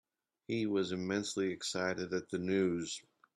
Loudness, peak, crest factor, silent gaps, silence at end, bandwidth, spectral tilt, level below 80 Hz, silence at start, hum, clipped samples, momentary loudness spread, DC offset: -36 LUFS; -20 dBFS; 16 dB; none; 0.35 s; 12.5 kHz; -4.5 dB/octave; -74 dBFS; 0.5 s; none; under 0.1%; 7 LU; under 0.1%